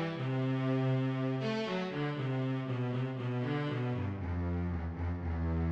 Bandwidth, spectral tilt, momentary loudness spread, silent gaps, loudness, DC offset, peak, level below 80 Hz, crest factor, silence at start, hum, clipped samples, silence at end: 7 kHz; -8.5 dB/octave; 5 LU; none; -35 LUFS; under 0.1%; -22 dBFS; -48 dBFS; 12 dB; 0 s; none; under 0.1%; 0 s